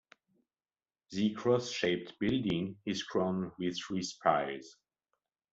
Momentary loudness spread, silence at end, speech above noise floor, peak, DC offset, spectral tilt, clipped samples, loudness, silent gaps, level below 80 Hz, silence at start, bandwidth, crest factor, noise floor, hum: 7 LU; 0.8 s; over 57 dB; -12 dBFS; under 0.1%; -5 dB/octave; under 0.1%; -34 LUFS; none; -66 dBFS; 1.1 s; 8 kHz; 22 dB; under -90 dBFS; none